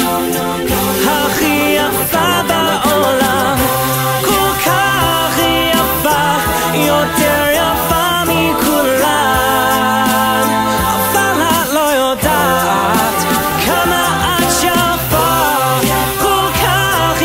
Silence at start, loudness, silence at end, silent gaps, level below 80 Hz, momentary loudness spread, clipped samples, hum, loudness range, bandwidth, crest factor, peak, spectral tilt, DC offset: 0 s; -12 LUFS; 0 s; none; -32 dBFS; 2 LU; under 0.1%; none; 0 LU; 16.5 kHz; 12 dB; 0 dBFS; -3.5 dB/octave; under 0.1%